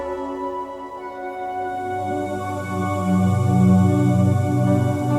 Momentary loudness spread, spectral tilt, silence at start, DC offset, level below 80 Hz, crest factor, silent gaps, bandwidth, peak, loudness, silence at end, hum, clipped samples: 14 LU; -8.5 dB/octave; 0 s; under 0.1%; -54 dBFS; 16 dB; none; 13.5 kHz; -4 dBFS; -21 LUFS; 0 s; none; under 0.1%